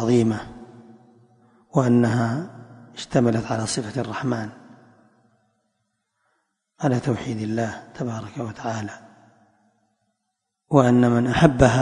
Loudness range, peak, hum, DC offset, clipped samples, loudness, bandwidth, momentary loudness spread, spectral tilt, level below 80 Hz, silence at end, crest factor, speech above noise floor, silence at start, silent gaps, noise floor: 8 LU; 0 dBFS; none; under 0.1%; under 0.1%; -22 LUFS; 11 kHz; 19 LU; -6.5 dB/octave; -46 dBFS; 0 s; 24 dB; 58 dB; 0 s; none; -79 dBFS